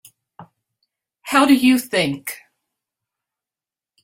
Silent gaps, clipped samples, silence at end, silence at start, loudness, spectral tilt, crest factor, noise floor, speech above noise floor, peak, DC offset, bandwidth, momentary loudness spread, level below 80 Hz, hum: none; under 0.1%; 1.65 s; 0.4 s; -17 LUFS; -4 dB/octave; 20 dB; under -90 dBFS; over 74 dB; -2 dBFS; under 0.1%; 16.5 kHz; 22 LU; -62 dBFS; none